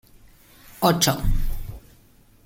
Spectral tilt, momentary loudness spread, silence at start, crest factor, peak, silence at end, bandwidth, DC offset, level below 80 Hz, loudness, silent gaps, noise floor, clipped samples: -4 dB/octave; 19 LU; 0.8 s; 20 dB; -4 dBFS; 0.65 s; 17 kHz; under 0.1%; -28 dBFS; -22 LUFS; none; -54 dBFS; under 0.1%